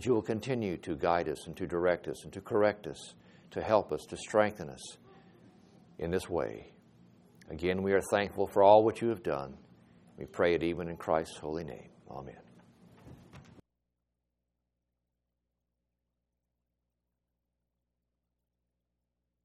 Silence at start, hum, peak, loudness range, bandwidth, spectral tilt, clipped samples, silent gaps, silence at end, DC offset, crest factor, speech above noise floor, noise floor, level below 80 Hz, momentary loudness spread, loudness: 0 s; 60 Hz at -65 dBFS; -8 dBFS; 11 LU; 13.5 kHz; -6 dB/octave; under 0.1%; none; 6.05 s; under 0.1%; 26 dB; 54 dB; -85 dBFS; -62 dBFS; 18 LU; -31 LUFS